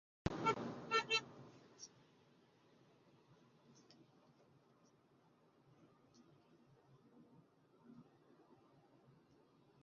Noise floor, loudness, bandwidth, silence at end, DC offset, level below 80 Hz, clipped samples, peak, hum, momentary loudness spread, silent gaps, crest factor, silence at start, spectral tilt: -73 dBFS; -40 LUFS; 7.2 kHz; 1.8 s; under 0.1%; -70 dBFS; under 0.1%; -22 dBFS; none; 27 LU; none; 28 dB; 0.25 s; -2 dB/octave